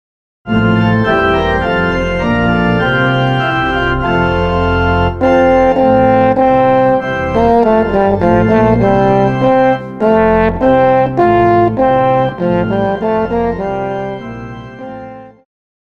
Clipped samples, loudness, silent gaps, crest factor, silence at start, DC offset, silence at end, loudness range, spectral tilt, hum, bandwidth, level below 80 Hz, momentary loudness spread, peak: under 0.1%; -12 LUFS; none; 12 dB; 0.45 s; under 0.1%; 0.65 s; 4 LU; -8 dB/octave; none; 7.2 kHz; -30 dBFS; 8 LU; 0 dBFS